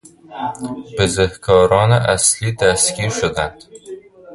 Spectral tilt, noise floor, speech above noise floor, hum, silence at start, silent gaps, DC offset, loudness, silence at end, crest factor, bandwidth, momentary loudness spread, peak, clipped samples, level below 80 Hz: -3.5 dB/octave; -36 dBFS; 20 dB; none; 0.3 s; none; under 0.1%; -16 LUFS; 0 s; 18 dB; 11.5 kHz; 23 LU; 0 dBFS; under 0.1%; -38 dBFS